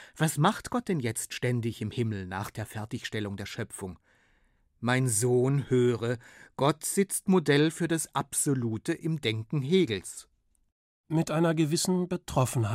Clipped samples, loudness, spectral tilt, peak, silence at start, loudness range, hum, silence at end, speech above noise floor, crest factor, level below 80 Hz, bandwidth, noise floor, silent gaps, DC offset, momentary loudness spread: under 0.1%; -29 LUFS; -5 dB/octave; -10 dBFS; 0 s; 7 LU; none; 0 s; 39 dB; 18 dB; -60 dBFS; 16 kHz; -67 dBFS; 10.72-11.04 s; under 0.1%; 12 LU